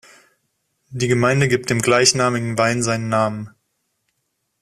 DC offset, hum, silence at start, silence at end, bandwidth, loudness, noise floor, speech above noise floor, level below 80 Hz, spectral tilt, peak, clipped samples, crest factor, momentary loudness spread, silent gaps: under 0.1%; none; 0.9 s; 1.15 s; 15 kHz; -18 LUFS; -73 dBFS; 55 dB; -54 dBFS; -4 dB/octave; 0 dBFS; under 0.1%; 20 dB; 12 LU; none